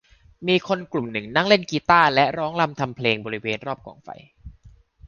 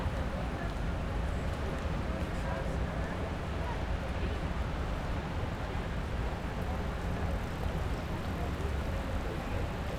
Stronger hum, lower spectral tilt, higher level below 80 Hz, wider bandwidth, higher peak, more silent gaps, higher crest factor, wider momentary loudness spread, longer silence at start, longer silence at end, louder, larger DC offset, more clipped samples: neither; about the same, -5.5 dB/octave vs -6.5 dB/octave; second, -54 dBFS vs -38 dBFS; second, 7.2 kHz vs 14.5 kHz; first, -2 dBFS vs -22 dBFS; neither; first, 22 dB vs 12 dB; first, 18 LU vs 1 LU; first, 0.4 s vs 0 s; about the same, 0 s vs 0 s; first, -21 LUFS vs -36 LUFS; neither; neither